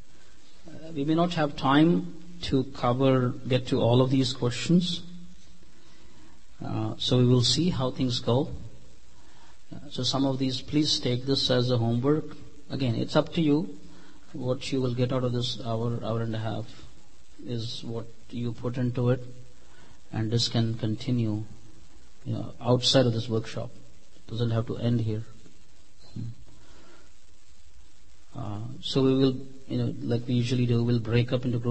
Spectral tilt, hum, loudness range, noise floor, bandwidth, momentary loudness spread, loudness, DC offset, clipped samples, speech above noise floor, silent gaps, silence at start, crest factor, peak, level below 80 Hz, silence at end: -6 dB/octave; none; 8 LU; -57 dBFS; 8.8 kHz; 17 LU; -27 LUFS; 2%; under 0.1%; 31 dB; none; 0.65 s; 20 dB; -8 dBFS; -54 dBFS; 0 s